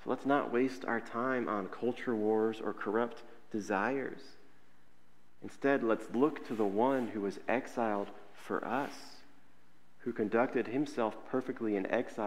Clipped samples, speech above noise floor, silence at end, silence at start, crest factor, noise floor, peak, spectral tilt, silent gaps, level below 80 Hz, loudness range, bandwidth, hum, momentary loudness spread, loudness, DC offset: under 0.1%; 35 dB; 0 s; 0 s; 20 dB; -69 dBFS; -16 dBFS; -6.5 dB/octave; none; -78 dBFS; 4 LU; 15 kHz; none; 12 LU; -34 LUFS; 0.4%